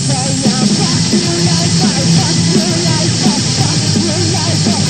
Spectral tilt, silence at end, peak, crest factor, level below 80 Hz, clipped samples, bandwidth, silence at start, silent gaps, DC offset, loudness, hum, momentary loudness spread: -4 dB/octave; 0 s; 0 dBFS; 12 dB; -42 dBFS; under 0.1%; 14 kHz; 0 s; none; 0.5%; -11 LUFS; none; 2 LU